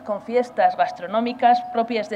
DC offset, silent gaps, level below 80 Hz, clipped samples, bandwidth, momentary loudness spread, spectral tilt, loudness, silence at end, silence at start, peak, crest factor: under 0.1%; none; -68 dBFS; under 0.1%; 8.6 kHz; 6 LU; -5.5 dB/octave; -21 LUFS; 0 s; 0 s; -4 dBFS; 16 dB